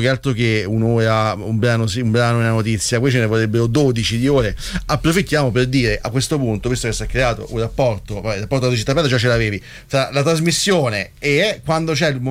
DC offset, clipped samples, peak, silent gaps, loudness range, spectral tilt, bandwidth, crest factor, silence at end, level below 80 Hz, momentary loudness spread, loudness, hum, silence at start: under 0.1%; under 0.1%; -4 dBFS; none; 2 LU; -5 dB/octave; 15.5 kHz; 12 dB; 0 s; -34 dBFS; 5 LU; -17 LUFS; none; 0 s